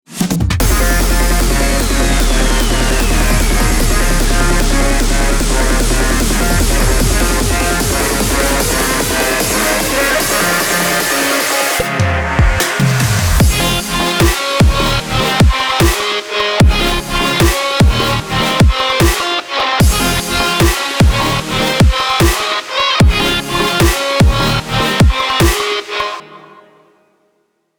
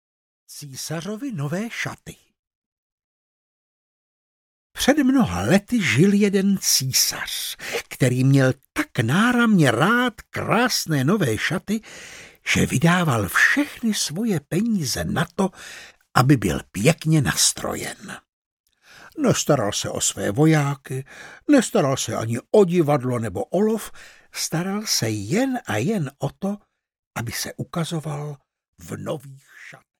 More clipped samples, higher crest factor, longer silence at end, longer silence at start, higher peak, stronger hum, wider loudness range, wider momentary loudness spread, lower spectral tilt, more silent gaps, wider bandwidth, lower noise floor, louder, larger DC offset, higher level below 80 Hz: neither; second, 12 dB vs 22 dB; first, 1.4 s vs 0.25 s; second, 0.1 s vs 0.5 s; about the same, -2 dBFS vs 0 dBFS; neither; second, 1 LU vs 11 LU; second, 3 LU vs 15 LU; about the same, -4 dB/octave vs -4.5 dB/octave; second, none vs 2.39-2.43 s, 2.55-2.98 s, 3.04-4.70 s, 18.33-18.64 s, 26.99-27.11 s, 28.68-28.73 s; first, over 20 kHz vs 18 kHz; first, -62 dBFS vs -49 dBFS; first, -13 LUFS vs -21 LUFS; neither; first, -16 dBFS vs -52 dBFS